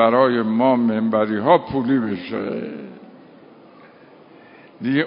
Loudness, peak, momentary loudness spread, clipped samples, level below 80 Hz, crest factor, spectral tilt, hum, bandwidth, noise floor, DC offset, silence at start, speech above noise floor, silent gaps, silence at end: -19 LUFS; -2 dBFS; 12 LU; under 0.1%; -58 dBFS; 18 dB; -11.5 dB/octave; none; 5.4 kHz; -47 dBFS; under 0.1%; 0 s; 28 dB; none; 0 s